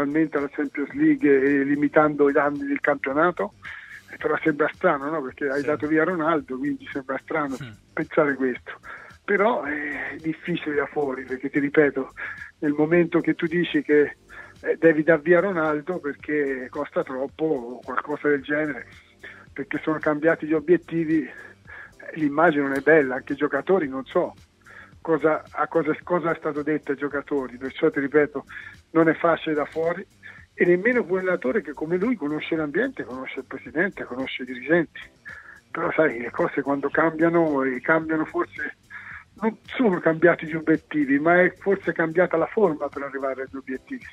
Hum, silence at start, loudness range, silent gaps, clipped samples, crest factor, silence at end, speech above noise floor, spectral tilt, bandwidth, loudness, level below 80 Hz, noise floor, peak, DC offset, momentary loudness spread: none; 0 s; 5 LU; none; under 0.1%; 20 dB; 0 s; 25 dB; -8 dB/octave; 8.4 kHz; -23 LUFS; -60 dBFS; -48 dBFS; -2 dBFS; under 0.1%; 15 LU